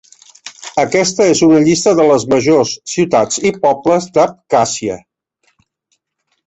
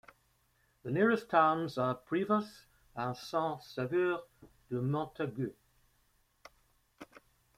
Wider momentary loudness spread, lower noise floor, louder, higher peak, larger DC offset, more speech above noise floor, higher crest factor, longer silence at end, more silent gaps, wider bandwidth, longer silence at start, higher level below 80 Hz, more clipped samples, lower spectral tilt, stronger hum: about the same, 12 LU vs 13 LU; second, -68 dBFS vs -73 dBFS; first, -13 LUFS vs -33 LUFS; first, 0 dBFS vs -12 dBFS; neither; first, 56 dB vs 40 dB; second, 12 dB vs 22 dB; first, 1.5 s vs 0.4 s; neither; second, 8.4 kHz vs 15.5 kHz; second, 0.45 s vs 0.85 s; first, -52 dBFS vs -70 dBFS; neither; second, -4.5 dB/octave vs -7 dB/octave; neither